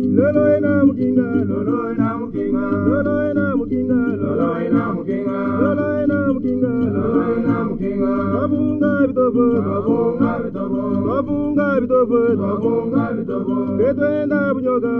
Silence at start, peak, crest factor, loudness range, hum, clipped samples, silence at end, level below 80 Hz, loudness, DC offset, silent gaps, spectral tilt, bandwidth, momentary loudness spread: 0 s; 0 dBFS; 18 dB; 1 LU; none; under 0.1%; 0 s; -44 dBFS; -18 LUFS; under 0.1%; none; -11 dB/octave; 4.2 kHz; 5 LU